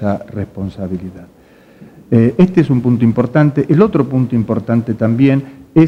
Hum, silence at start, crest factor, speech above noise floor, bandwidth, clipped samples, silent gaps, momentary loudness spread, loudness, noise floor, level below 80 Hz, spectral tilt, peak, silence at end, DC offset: none; 0 s; 14 dB; 28 dB; 7 kHz; under 0.1%; none; 13 LU; -14 LUFS; -41 dBFS; -46 dBFS; -10 dB/octave; 0 dBFS; 0 s; under 0.1%